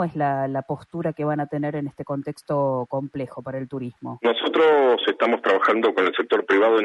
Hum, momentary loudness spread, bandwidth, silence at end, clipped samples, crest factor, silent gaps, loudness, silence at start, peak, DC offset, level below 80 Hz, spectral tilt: none; 13 LU; 11 kHz; 0 s; under 0.1%; 16 dB; none; -22 LUFS; 0 s; -6 dBFS; under 0.1%; -66 dBFS; -7 dB/octave